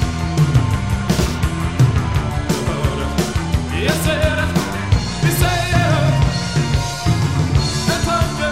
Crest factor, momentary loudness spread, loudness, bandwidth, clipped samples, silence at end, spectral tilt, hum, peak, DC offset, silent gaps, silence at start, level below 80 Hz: 14 dB; 4 LU; -18 LUFS; 16 kHz; under 0.1%; 0 s; -5.5 dB/octave; none; -2 dBFS; 1%; none; 0 s; -26 dBFS